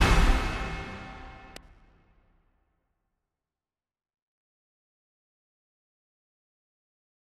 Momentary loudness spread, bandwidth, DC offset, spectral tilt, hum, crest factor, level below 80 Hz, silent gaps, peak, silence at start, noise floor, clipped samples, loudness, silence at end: 24 LU; 13.5 kHz; under 0.1%; -5 dB/octave; none; 24 dB; -34 dBFS; none; -10 dBFS; 0 s; under -90 dBFS; under 0.1%; -29 LUFS; 6 s